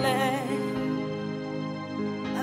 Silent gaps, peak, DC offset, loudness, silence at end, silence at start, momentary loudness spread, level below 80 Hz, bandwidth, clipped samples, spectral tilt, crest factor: none; -12 dBFS; under 0.1%; -30 LUFS; 0 s; 0 s; 7 LU; -62 dBFS; 16 kHz; under 0.1%; -5.5 dB/octave; 16 dB